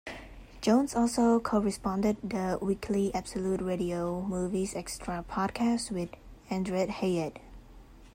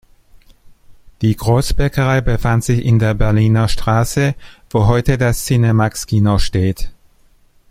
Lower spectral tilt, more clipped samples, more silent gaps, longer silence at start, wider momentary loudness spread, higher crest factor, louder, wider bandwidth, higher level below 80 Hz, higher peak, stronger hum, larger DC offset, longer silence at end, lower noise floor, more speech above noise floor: about the same, -6 dB/octave vs -6.5 dB/octave; neither; neither; second, 0.05 s vs 0.9 s; first, 11 LU vs 6 LU; about the same, 18 dB vs 14 dB; second, -30 LUFS vs -15 LUFS; about the same, 16 kHz vs 15.5 kHz; second, -52 dBFS vs -26 dBFS; second, -14 dBFS vs -2 dBFS; neither; neither; second, 0.05 s vs 0.8 s; about the same, -52 dBFS vs -51 dBFS; second, 22 dB vs 37 dB